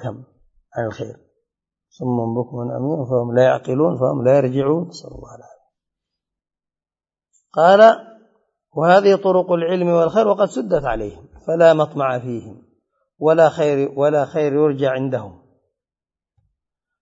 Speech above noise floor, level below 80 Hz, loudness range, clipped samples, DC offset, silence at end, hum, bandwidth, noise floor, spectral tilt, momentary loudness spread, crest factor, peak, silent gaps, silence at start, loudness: over 73 dB; -50 dBFS; 7 LU; under 0.1%; under 0.1%; 1.7 s; none; 8 kHz; under -90 dBFS; -7 dB/octave; 16 LU; 18 dB; 0 dBFS; none; 0 s; -17 LUFS